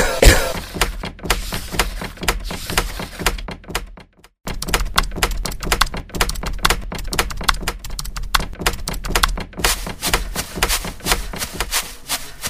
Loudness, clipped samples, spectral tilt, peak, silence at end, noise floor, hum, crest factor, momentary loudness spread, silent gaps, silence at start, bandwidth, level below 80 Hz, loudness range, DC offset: -21 LUFS; under 0.1%; -2.5 dB/octave; 0 dBFS; 0 s; -44 dBFS; none; 20 dB; 9 LU; none; 0 s; 16 kHz; -24 dBFS; 3 LU; under 0.1%